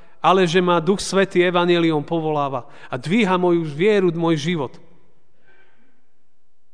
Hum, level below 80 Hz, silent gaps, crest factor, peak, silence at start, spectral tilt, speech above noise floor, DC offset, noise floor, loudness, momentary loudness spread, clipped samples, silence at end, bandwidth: none; -56 dBFS; none; 18 dB; -2 dBFS; 0.25 s; -5.5 dB/octave; 51 dB; 1%; -69 dBFS; -19 LUFS; 9 LU; under 0.1%; 2.05 s; 10 kHz